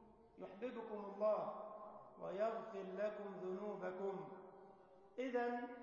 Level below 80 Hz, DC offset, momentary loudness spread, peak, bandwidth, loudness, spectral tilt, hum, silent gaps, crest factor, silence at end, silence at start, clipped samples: -84 dBFS; under 0.1%; 17 LU; -30 dBFS; 7 kHz; -46 LUFS; -5 dB/octave; none; none; 18 dB; 0 s; 0 s; under 0.1%